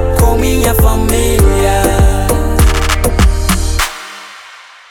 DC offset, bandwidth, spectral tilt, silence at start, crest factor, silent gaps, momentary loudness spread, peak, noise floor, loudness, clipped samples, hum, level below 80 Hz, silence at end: under 0.1%; 18.5 kHz; -5 dB/octave; 0 s; 10 dB; none; 13 LU; 0 dBFS; -36 dBFS; -12 LUFS; under 0.1%; none; -14 dBFS; 0.35 s